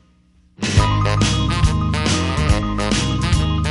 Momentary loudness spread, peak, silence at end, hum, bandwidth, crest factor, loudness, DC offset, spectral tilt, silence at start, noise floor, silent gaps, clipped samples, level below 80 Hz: 2 LU; -2 dBFS; 0 s; none; 11.5 kHz; 16 dB; -18 LUFS; under 0.1%; -5 dB/octave; 0.6 s; -54 dBFS; none; under 0.1%; -24 dBFS